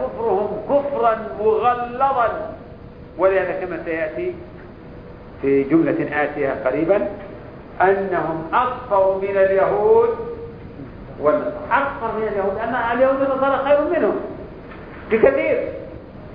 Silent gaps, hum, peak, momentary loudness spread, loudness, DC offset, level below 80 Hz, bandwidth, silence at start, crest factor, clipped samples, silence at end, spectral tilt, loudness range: none; none; -2 dBFS; 20 LU; -19 LUFS; under 0.1%; -46 dBFS; 5.2 kHz; 0 s; 18 dB; under 0.1%; 0 s; -10 dB/octave; 4 LU